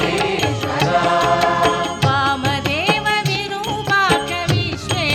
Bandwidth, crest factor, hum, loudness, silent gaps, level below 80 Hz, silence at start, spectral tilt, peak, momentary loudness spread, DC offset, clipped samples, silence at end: 18.5 kHz; 16 dB; none; -17 LUFS; none; -42 dBFS; 0 s; -4.5 dB/octave; -2 dBFS; 5 LU; under 0.1%; under 0.1%; 0 s